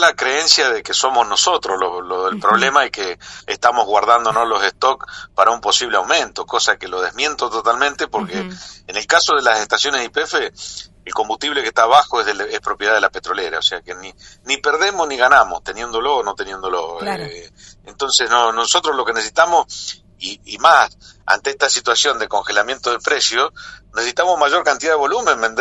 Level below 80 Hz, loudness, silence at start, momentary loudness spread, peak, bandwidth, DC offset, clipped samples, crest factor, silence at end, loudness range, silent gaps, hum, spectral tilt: -52 dBFS; -16 LUFS; 0 s; 14 LU; 0 dBFS; 11.5 kHz; under 0.1%; under 0.1%; 18 dB; 0 s; 2 LU; none; none; -0.5 dB/octave